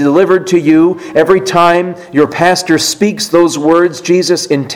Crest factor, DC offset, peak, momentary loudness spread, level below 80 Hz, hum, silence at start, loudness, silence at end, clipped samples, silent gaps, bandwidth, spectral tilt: 10 dB; under 0.1%; 0 dBFS; 4 LU; -50 dBFS; none; 0 s; -10 LUFS; 0 s; 0.7%; none; 16.5 kHz; -4.5 dB/octave